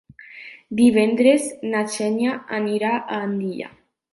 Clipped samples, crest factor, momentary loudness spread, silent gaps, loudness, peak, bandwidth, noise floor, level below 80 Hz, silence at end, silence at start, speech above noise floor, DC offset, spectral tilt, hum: under 0.1%; 18 dB; 19 LU; none; -21 LUFS; -4 dBFS; 11.5 kHz; -42 dBFS; -64 dBFS; 0.45 s; 0.3 s; 22 dB; under 0.1%; -5 dB/octave; none